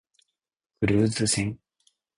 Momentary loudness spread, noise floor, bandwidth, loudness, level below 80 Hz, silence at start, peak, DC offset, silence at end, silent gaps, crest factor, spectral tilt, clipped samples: 10 LU; -84 dBFS; 11 kHz; -25 LUFS; -50 dBFS; 0.8 s; -10 dBFS; under 0.1%; 0.6 s; none; 18 dB; -4.5 dB/octave; under 0.1%